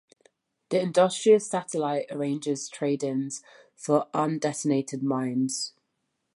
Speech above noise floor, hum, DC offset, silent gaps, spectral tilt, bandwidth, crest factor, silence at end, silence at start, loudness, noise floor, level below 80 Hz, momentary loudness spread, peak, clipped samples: 52 dB; none; under 0.1%; none; -5 dB/octave; 11.5 kHz; 18 dB; 0.65 s; 0.7 s; -27 LUFS; -78 dBFS; -80 dBFS; 10 LU; -8 dBFS; under 0.1%